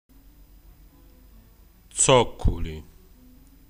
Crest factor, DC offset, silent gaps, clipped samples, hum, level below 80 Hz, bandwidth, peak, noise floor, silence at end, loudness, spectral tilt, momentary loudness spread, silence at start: 24 dB; under 0.1%; none; under 0.1%; none; -36 dBFS; 15.5 kHz; -4 dBFS; -53 dBFS; 0.9 s; -22 LUFS; -3.5 dB/octave; 19 LU; 1.95 s